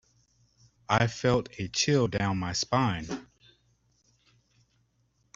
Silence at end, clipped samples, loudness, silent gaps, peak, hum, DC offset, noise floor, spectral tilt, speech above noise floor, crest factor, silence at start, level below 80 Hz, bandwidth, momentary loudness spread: 2.1 s; under 0.1%; -28 LUFS; none; -8 dBFS; none; under 0.1%; -71 dBFS; -4.5 dB/octave; 44 dB; 24 dB; 0.9 s; -56 dBFS; 7.8 kHz; 9 LU